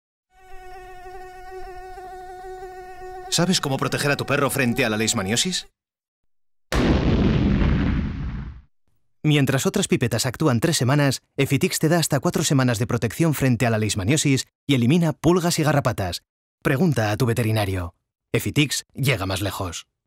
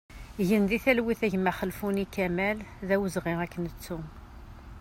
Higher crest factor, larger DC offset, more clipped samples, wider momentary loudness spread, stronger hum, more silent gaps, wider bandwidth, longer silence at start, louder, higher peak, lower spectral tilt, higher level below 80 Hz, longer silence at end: second, 14 dB vs 20 dB; neither; neither; about the same, 18 LU vs 20 LU; neither; first, 6.08-6.23 s, 14.55-14.67 s, 16.29-16.58 s vs none; about the same, 16 kHz vs 16 kHz; first, 0.5 s vs 0.1 s; first, -21 LUFS vs -29 LUFS; about the same, -8 dBFS vs -10 dBFS; second, -5 dB/octave vs -6.5 dB/octave; first, -36 dBFS vs -48 dBFS; first, 0.25 s vs 0 s